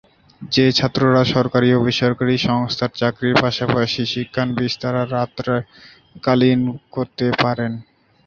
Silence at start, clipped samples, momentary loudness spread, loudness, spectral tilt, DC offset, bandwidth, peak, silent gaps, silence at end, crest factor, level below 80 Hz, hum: 0.4 s; under 0.1%; 9 LU; -18 LUFS; -6.5 dB/octave; under 0.1%; 7.2 kHz; -2 dBFS; none; 0.45 s; 18 dB; -50 dBFS; none